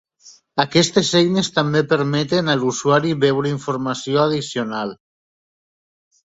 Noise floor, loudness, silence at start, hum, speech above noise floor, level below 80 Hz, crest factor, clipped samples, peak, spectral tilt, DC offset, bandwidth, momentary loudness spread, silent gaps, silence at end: -49 dBFS; -18 LUFS; 0.25 s; none; 31 dB; -58 dBFS; 18 dB; under 0.1%; -2 dBFS; -5 dB/octave; under 0.1%; 8 kHz; 8 LU; none; 1.4 s